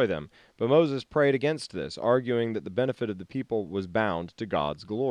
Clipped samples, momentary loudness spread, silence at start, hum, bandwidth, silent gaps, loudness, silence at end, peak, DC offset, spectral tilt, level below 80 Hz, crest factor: under 0.1%; 10 LU; 0 s; none; 10.5 kHz; none; -28 LUFS; 0 s; -10 dBFS; under 0.1%; -6.5 dB/octave; -62 dBFS; 18 dB